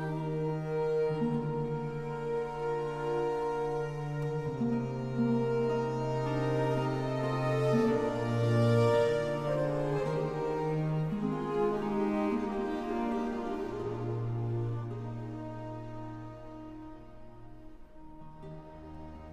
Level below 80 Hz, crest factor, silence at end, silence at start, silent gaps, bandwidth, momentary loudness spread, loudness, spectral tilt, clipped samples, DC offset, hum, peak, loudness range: -54 dBFS; 18 dB; 0 s; 0 s; none; 11.5 kHz; 18 LU; -32 LUFS; -8 dB/octave; under 0.1%; under 0.1%; none; -16 dBFS; 13 LU